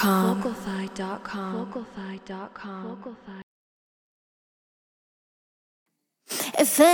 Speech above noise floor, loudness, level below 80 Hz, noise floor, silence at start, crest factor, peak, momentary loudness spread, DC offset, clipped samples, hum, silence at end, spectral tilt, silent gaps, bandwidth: over 65 dB; -28 LUFS; -64 dBFS; under -90 dBFS; 0 s; 22 dB; -4 dBFS; 19 LU; under 0.1%; under 0.1%; none; 0 s; -4 dB/octave; 3.43-5.86 s; over 20 kHz